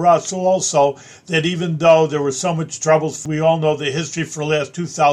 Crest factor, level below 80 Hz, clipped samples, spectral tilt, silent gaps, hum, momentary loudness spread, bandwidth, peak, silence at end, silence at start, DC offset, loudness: 16 dB; -62 dBFS; under 0.1%; -4.5 dB/octave; none; none; 9 LU; 12 kHz; -2 dBFS; 0 s; 0 s; under 0.1%; -18 LUFS